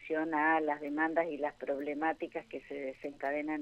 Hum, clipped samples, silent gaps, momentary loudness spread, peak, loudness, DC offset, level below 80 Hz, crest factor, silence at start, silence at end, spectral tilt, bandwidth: none; under 0.1%; none; 12 LU; -16 dBFS; -35 LUFS; under 0.1%; -70 dBFS; 18 dB; 0 s; 0 s; -6.5 dB/octave; 8.2 kHz